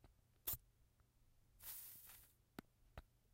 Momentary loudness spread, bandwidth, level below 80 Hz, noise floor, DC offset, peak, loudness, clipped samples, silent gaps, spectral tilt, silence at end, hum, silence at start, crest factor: 18 LU; 16 kHz; -70 dBFS; -76 dBFS; under 0.1%; -32 dBFS; -52 LUFS; under 0.1%; none; -2.5 dB/octave; 0.05 s; none; 0 s; 26 dB